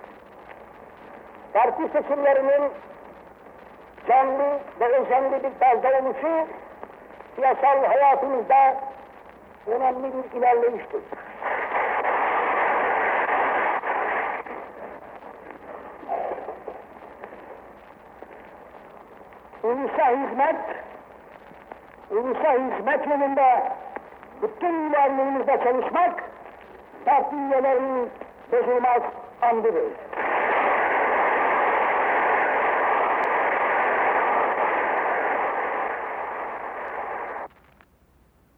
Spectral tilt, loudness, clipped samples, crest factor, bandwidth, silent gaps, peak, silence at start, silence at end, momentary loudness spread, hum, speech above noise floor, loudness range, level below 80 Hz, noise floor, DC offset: -6.5 dB/octave; -23 LUFS; under 0.1%; 14 dB; 4.4 kHz; none; -10 dBFS; 0 s; 1.1 s; 21 LU; none; 38 dB; 9 LU; -62 dBFS; -59 dBFS; under 0.1%